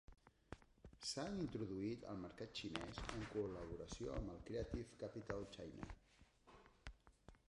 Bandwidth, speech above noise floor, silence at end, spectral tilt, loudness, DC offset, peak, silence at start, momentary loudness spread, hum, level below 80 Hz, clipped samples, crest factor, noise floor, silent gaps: 11 kHz; 22 dB; 0.15 s; -5 dB/octave; -49 LUFS; under 0.1%; -26 dBFS; 0.1 s; 18 LU; none; -62 dBFS; under 0.1%; 24 dB; -71 dBFS; none